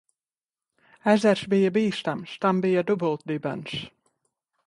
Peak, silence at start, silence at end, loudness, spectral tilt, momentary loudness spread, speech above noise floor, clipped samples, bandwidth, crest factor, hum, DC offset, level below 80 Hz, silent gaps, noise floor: -6 dBFS; 1.05 s; 0.8 s; -25 LUFS; -6.5 dB/octave; 12 LU; over 66 dB; under 0.1%; 11.5 kHz; 20 dB; none; under 0.1%; -66 dBFS; none; under -90 dBFS